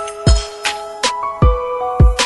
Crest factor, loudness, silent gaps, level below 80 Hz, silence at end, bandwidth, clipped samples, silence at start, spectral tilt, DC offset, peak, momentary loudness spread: 14 dB; -17 LUFS; none; -18 dBFS; 0 s; 12 kHz; under 0.1%; 0 s; -4.5 dB/octave; under 0.1%; 0 dBFS; 7 LU